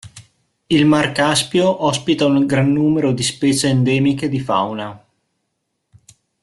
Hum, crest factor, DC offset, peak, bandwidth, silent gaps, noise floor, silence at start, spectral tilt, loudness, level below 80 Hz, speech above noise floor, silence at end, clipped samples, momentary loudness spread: none; 14 dB; under 0.1%; -2 dBFS; 12.5 kHz; none; -73 dBFS; 0.05 s; -5 dB/octave; -16 LUFS; -52 dBFS; 57 dB; 1.45 s; under 0.1%; 5 LU